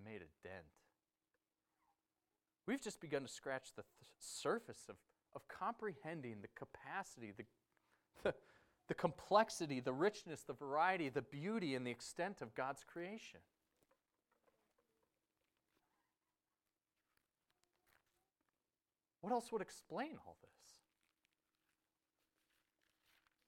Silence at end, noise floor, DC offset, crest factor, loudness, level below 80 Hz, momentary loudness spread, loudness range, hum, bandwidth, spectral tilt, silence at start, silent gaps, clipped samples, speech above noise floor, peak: 2.75 s; under -90 dBFS; under 0.1%; 28 dB; -44 LUFS; -82 dBFS; 20 LU; 12 LU; none; 16 kHz; -4.5 dB/octave; 0 s; none; under 0.1%; over 45 dB; -20 dBFS